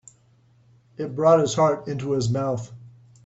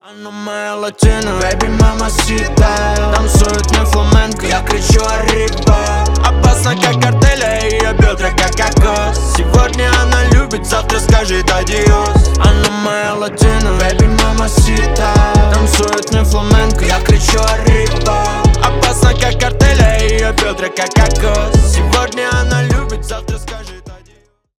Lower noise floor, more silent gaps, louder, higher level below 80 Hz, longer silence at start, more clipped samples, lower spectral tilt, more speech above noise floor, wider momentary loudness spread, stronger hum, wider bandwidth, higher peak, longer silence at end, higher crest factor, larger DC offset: first, -58 dBFS vs -49 dBFS; neither; second, -22 LUFS vs -12 LUFS; second, -60 dBFS vs -14 dBFS; first, 1 s vs 0.1 s; neither; first, -6 dB/octave vs -4.5 dB/octave; about the same, 37 dB vs 39 dB; first, 14 LU vs 5 LU; neither; second, 8.2 kHz vs 15 kHz; second, -6 dBFS vs 0 dBFS; second, 0.35 s vs 0.65 s; first, 18 dB vs 10 dB; neither